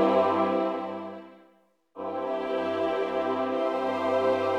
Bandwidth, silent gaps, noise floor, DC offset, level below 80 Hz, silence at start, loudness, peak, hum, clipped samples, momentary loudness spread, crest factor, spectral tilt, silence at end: 9.6 kHz; none; -63 dBFS; under 0.1%; -68 dBFS; 0 s; -28 LUFS; -10 dBFS; none; under 0.1%; 12 LU; 18 dB; -6.5 dB/octave; 0 s